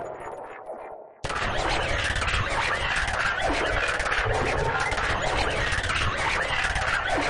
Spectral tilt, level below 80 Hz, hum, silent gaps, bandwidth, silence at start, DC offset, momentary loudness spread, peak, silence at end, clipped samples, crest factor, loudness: -3.5 dB/octave; -36 dBFS; none; none; 11.5 kHz; 0 s; under 0.1%; 13 LU; -12 dBFS; 0 s; under 0.1%; 16 dB; -25 LUFS